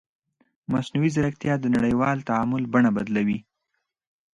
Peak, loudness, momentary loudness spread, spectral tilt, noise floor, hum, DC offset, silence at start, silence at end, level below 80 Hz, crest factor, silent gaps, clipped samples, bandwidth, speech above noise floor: -8 dBFS; -24 LUFS; 7 LU; -7.5 dB/octave; -78 dBFS; none; under 0.1%; 0.7 s; 0.95 s; -54 dBFS; 16 dB; none; under 0.1%; 10 kHz; 56 dB